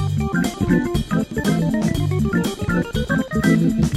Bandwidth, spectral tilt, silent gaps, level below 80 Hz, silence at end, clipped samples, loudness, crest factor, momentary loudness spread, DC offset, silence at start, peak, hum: 15.5 kHz; -6.5 dB/octave; none; -34 dBFS; 0 s; under 0.1%; -20 LUFS; 14 dB; 4 LU; under 0.1%; 0 s; -6 dBFS; none